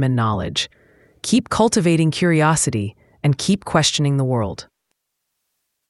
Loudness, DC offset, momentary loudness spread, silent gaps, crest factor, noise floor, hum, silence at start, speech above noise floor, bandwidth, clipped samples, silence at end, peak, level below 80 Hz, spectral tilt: -18 LUFS; under 0.1%; 11 LU; none; 18 dB; -76 dBFS; none; 0 s; 58 dB; 12 kHz; under 0.1%; 1.25 s; -2 dBFS; -48 dBFS; -5 dB/octave